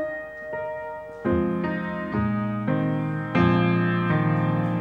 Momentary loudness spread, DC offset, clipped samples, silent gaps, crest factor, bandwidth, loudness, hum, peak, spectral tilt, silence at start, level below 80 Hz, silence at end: 11 LU; under 0.1%; under 0.1%; none; 18 dB; 5.2 kHz; -25 LUFS; none; -6 dBFS; -9.5 dB/octave; 0 s; -48 dBFS; 0 s